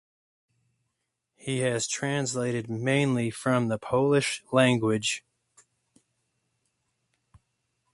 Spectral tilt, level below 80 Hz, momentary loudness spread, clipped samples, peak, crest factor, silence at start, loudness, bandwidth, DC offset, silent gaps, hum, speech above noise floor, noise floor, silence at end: -4.5 dB/octave; -66 dBFS; 7 LU; under 0.1%; -8 dBFS; 22 dB; 1.45 s; -26 LUFS; 11.5 kHz; under 0.1%; none; none; 55 dB; -81 dBFS; 2.75 s